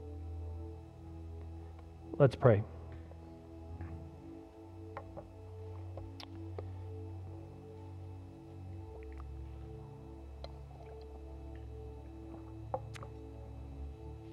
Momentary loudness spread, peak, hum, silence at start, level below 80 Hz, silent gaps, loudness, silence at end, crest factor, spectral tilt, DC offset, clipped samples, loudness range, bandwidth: 8 LU; -12 dBFS; none; 0 s; -52 dBFS; none; -41 LUFS; 0 s; 28 dB; -8.5 dB/octave; under 0.1%; under 0.1%; 14 LU; 11 kHz